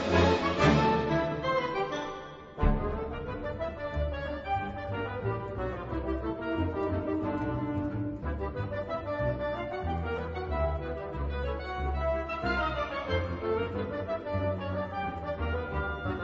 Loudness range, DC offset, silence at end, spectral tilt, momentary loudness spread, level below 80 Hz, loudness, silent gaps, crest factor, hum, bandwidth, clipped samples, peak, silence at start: 4 LU; under 0.1%; 0 s; -7 dB/octave; 9 LU; -40 dBFS; -32 LUFS; none; 20 dB; none; 7.8 kHz; under 0.1%; -10 dBFS; 0 s